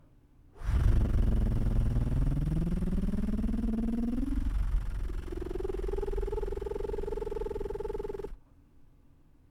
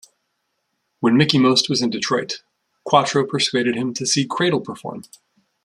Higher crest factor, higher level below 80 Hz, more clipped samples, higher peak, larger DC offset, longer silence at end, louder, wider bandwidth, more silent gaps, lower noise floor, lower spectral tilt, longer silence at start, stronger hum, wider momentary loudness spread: about the same, 16 dB vs 20 dB; first, -32 dBFS vs -62 dBFS; neither; second, -14 dBFS vs 0 dBFS; neither; about the same, 0.65 s vs 0.6 s; second, -34 LUFS vs -18 LUFS; second, 11 kHz vs 12.5 kHz; neither; second, -59 dBFS vs -73 dBFS; first, -9 dB/octave vs -4 dB/octave; second, 0.55 s vs 1 s; neither; second, 9 LU vs 17 LU